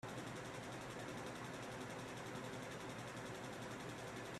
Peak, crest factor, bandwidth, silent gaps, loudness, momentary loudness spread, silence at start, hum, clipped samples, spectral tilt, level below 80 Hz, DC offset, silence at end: -36 dBFS; 14 dB; 14.5 kHz; none; -49 LUFS; 1 LU; 0.05 s; none; under 0.1%; -4.5 dB/octave; -72 dBFS; under 0.1%; 0 s